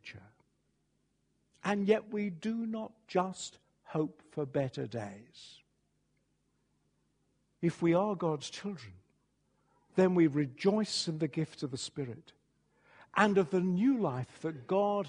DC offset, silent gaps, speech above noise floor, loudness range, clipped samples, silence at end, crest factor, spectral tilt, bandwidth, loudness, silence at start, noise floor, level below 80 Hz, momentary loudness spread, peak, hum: under 0.1%; none; 45 dB; 8 LU; under 0.1%; 0 s; 24 dB; -6 dB/octave; 10.5 kHz; -33 LUFS; 0.05 s; -77 dBFS; -74 dBFS; 14 LU; -10 dBFS; none